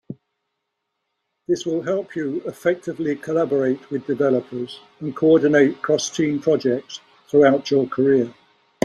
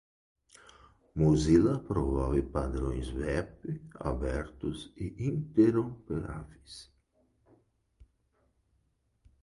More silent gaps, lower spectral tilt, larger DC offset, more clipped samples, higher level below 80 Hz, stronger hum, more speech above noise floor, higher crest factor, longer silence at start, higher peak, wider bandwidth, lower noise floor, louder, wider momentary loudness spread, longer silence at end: neither; second, -5.5 dB/octave vs -7.5 dB/octave; neither; neither; second, -66 dBFS vs -42 dBFS; neither; first, 58 dB vs 44 dB; about the same, 18 dB vs 20 dB; second, 0.1 s vs 1.15 s; first, -2 dBFS vs -12 dBFS; about the same, 12 kHz vs 11 kHz; first, -78 dBFS vs -74 dBFS; first, -20 LUFS vs -31 LUFS; about the same, 15 LU vs 17 LU; second, 0.5 s vs 2.6 s